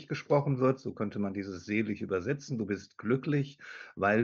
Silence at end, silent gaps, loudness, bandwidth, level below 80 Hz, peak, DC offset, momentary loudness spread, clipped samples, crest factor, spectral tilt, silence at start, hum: 0 s; none; -32 LUFS; 7.2 kHz; -70 dBFS; -14 dBFS; under 0.1%; 8 LU; under 0.1%; 18 dB; -7.5 dB/octave; 0 s; none